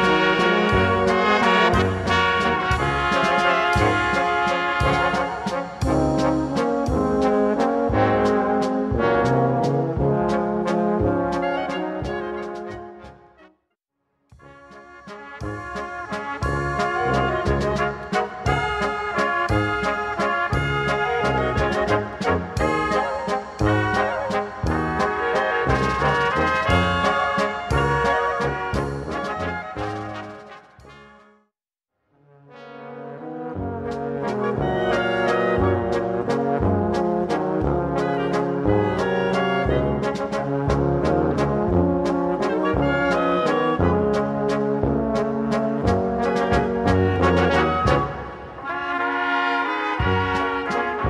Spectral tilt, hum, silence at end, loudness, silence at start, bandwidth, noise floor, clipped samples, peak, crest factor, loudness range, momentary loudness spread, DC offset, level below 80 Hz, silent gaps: -6.5 dB/octave; none; 0 s; -21 LUFS; 0 s; 12.5 kHz; -83 dBFS; under 0.1%; -4 dBFS; 18 dB; 11 LU; 10 LU; under 0.1%; -36 dBFS; none